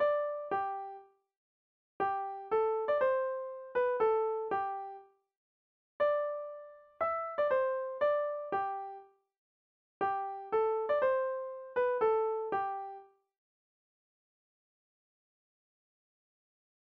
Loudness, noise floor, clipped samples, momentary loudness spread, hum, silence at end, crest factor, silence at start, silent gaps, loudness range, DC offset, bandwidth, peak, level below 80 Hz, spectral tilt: -33 LUFS; under -90 dBFS; under 0.1%; 12 LU; none; 3.9 s; 16 dB; 0 s; 1.37-2.00 s, 5.37-6.00 s, 9.38-10.00 s; 4 LU; under 0.1%; 5.2 kHz; -20 dBFS; -76 dBFS; -2 dB/octave